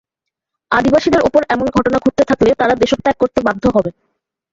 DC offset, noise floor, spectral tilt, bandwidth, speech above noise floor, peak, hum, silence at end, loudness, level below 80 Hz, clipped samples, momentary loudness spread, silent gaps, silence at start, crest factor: under 0.1%; -81 dBFS; -6 dB/octave; 7.8 kHz; 67 dB; 0 dBFS; none; 0.6 s; -14 LUFS; -40 dBFS; under 0.1%; 3 LU; none; 0.7 s; 14 dB